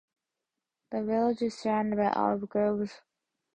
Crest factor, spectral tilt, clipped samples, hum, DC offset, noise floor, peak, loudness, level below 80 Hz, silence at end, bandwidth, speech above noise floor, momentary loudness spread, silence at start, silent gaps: 18 dB; -7 dB/octave; under 0.1%; none; under 0.1%; -88 dBFS; -12 dBFS; -30 LUFS; -66 dBFS; 0.6 s; 9 kHz; 59 dB; 8 LU; 0.9 s; none